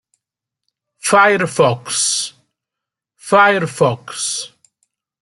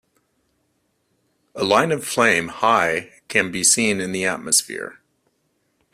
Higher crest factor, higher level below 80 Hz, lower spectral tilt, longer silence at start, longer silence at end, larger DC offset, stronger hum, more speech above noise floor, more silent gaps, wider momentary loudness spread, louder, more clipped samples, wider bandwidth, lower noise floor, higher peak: about the same, 16 dB vs 20 dB; about the same, -64 dBFS vs -60 dBFS; about the same, -3 dB/octave vs -2 dB/octave; second, 1.05 s vs 1.55 s; second, 0.75 s vs 1 s; neither; neither; first, 70 dB vs 49 dB; neither; about the same, 13 LU vs 13 LU; first, -15 LUFS vs -18 LUFS; neither; second, 12 kHz vs 15.5 kHz; first, -84 dBFS vs -69 dBFS; about the same, -2 dBFS vs -2 dBFS